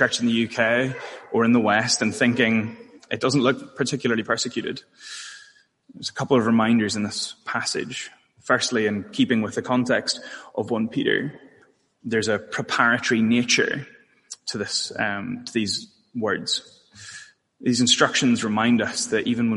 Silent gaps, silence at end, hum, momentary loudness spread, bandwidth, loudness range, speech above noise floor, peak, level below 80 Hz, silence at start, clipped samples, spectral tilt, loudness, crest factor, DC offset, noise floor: none; 0 s; none; 15 LU; 11.5 kHz; 4 LU; 36 dB; -2 dBFS; -66 dBFS; 0 s; under 0.1%; -3.5 dB/octave; -22 LUFS; 20 dB; under 0.1%; -58 dBFS